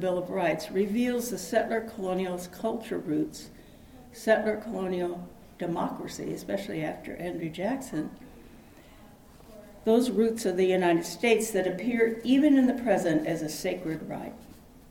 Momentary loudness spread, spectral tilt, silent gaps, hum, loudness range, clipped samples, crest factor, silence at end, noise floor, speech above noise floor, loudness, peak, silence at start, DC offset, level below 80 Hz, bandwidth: 12 LU; -5.5 dB/octave; none; none; 9 LU; under 0.1%; 20 dB; 0.1 s; -52 dBFS; 24 dB; -28 LUFS; -10 dBFS; 0 s; under 0.1%; -58 dBFS; 17.5 kHz